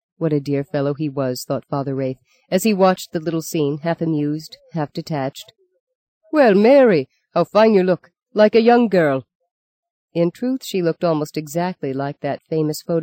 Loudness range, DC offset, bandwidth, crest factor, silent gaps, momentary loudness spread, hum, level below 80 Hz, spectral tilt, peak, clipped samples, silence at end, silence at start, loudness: 8 LU; under 0.1%; 17 kHz; 16 dB; 5.80-5.87 s, 5.95-6.21 s, 9.35-9.40 s, 9.51-9.83 s, 9.90-10.08 s; 13 LU; none; -66 dBFS; -6.5 dB/octave; -2 dBFS; under 0.1%; 0 s; 0.2 s; -19 LUFS